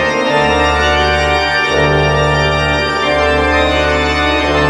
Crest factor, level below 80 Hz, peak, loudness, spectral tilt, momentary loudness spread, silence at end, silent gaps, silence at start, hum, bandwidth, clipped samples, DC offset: 12 dB; -24 dBFS; 0 dBFS; -12 LUFS; -5 dB/octave; 1 LU; 0 s; none; 0 s; none; 12 kHz; under 0.1%; under 0.1%